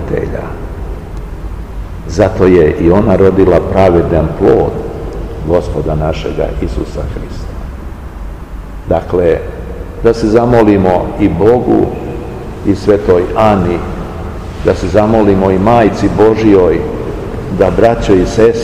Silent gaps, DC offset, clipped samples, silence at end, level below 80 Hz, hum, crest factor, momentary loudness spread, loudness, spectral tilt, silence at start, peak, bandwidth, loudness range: none; 0.9%; 2%; 0 s; -24 dBFS; none; 10 dB; 17 LU; -11 LUFS; -8 dB/octave; 0 s; 0 dBFS; 14 kHz; 8 LU